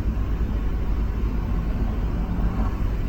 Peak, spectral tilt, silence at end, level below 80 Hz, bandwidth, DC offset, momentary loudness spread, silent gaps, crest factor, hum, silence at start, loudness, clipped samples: -12 dBFS; -8.5 dB/octave; 0 s; -24 dBFS; 6.4 kHz; under 0.1%; 1 LU; none; 12 dB; none; 0 s; -27 LUFS; under 0.1%